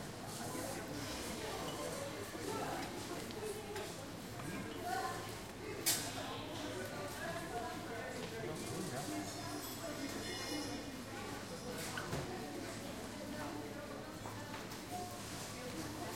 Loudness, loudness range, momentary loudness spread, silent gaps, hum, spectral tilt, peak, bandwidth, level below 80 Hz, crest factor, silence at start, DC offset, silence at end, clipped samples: -43 LUFS; 4 LU; 5 LU; none; none; -3.5 dB/octave; -20 dBFS; 16.5 kHz; -62 dBFS; 22 dB; 0 s; under 0.1%; 0 s; under 0.1%